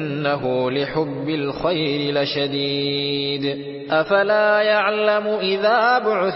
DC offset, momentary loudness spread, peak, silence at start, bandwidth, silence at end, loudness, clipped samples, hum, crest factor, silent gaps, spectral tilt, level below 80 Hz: under 0.1%; 7 LU; -6 dBFS; 0 s; 5.8 kHz; 0 s; -20 LUFS; under 0.1%; none; 14 dB; none; -9.5 dB/octave; -56 dBFS